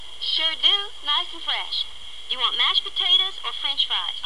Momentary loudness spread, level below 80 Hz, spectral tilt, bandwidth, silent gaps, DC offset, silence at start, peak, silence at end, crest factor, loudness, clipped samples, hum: 9 LU; -58 dBFS; 0 dB/octave; 12 kHz; none; 2%; 0 s; -6 dBFS; 0 s; 18 dB; -21 LUFS; under 0.1%; none